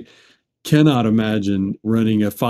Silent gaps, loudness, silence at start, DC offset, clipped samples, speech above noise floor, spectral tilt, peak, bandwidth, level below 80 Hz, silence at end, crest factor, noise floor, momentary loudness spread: none; -17 LUFS; 0 s; under 0.1%; under 0.1%; 38 dB; -7 dB/octave; -2 dBFS; 15 kHz; -54 dBFS; 0 s; 16 dB; -55 dBFS; 7 LU